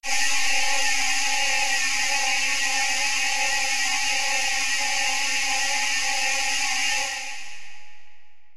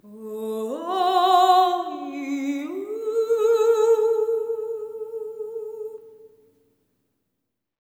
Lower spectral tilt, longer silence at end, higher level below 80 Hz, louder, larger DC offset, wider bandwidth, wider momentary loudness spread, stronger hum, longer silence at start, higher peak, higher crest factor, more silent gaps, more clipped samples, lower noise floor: second, 2 dB/octave vs -3.5 dB/octave; second, 0 s vs 1.6 s; first, -52 dBFS vs -84 dBFS; about the same, -22 LUFS vs -23 LUFS; first, 3% vs under 0.1%; about the same, 16 kHz vs 17.5 kHz; second, 1 LU vs 16 LU; neither; about the same, 0 s vs 0.05 s; second, -10 dBFS vs -6 dBFS; about the same, 14 dB vs 18 dB; neither; neither; second, -46 dBFS vs -80 dBFS